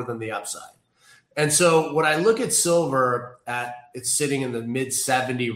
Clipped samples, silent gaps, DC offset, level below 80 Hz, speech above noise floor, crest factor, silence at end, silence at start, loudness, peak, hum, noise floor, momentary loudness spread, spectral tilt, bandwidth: under 0.1%; none; under 0.1%; -66 dBFS; 34 dB; 18 dB; 0 s; 0 s; -22 LUFS; -6 dBFS; none; -57 dBFS; 12 LU; -3.5 dB/octave; 16 kHz